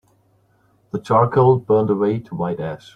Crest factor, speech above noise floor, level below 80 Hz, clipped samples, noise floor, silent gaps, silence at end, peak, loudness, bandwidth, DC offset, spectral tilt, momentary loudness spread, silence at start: 16 dB; 42 dB; -56 dBFS; under 0.1%; -59 dBFS; none; 0.2 s; -2 dBFS; -18 LUFS; 8.6 kHz; under 0.1%; -9.5 dB/octave; 13 LU; 0.95 s